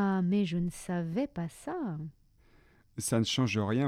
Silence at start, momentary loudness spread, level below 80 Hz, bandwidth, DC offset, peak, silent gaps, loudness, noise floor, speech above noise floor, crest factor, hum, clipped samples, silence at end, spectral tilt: 0 s; 11 LU; -60 dBFS; 15 kHz; under 0.1%; -16 dBFS; none; -32 LUFS; -62 dBFS; 31 dB; 16 dB; none; under 0.1%; 0 s; -5.5 dB/octave